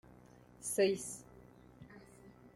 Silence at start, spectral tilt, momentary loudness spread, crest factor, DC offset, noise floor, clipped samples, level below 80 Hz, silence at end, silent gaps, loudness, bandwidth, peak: 0.6 s; -3.5 dB/octave; 26 LU; 20 dB; under 0.1%; -60 dBFS; under 0.1%; -70 dBFS; 0.05 s; none; -36 LUFS; 15.5 kHz; -20 dBFS